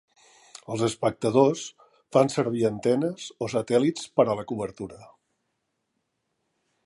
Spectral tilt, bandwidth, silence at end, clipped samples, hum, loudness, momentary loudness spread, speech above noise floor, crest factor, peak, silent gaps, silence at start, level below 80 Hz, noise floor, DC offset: -6 dB/octave; 11.5 kHz; 1.8 s; under 0.1%; none; -25 LUFS; 13 LU; 53 dB; 20 dB; -6 dBFS; none; 0.55 s; -64 dBFS; -78 dBFS; under 0.1%